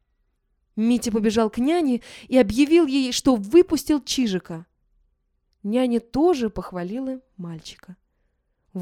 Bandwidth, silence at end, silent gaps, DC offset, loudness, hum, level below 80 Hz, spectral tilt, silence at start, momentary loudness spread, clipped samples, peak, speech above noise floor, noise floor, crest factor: 15.5 kHz; 0 s; none; under 0.1%; -21 LUFS; none; -50 dBFS; -5 dB/octave; 0.75 s; 18 LU; under 0.1%; -4 dBFS; 49 dB; -70 dBFS; 18 dB